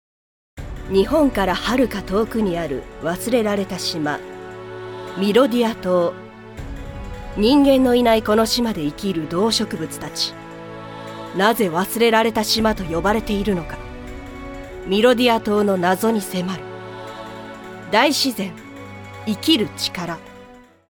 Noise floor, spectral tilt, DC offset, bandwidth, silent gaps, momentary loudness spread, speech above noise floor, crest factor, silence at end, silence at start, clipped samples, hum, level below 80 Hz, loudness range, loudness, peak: -45 dBFS; -4.5 dB/octave; under 0.1%; over 20 kHz; none; 19 LU; 26 dB; 20 dB; 0.35 s; 0.55 s; under 0.1%; none; -40 dBFS; 4 LU; -19 LUFS; -2 dBFS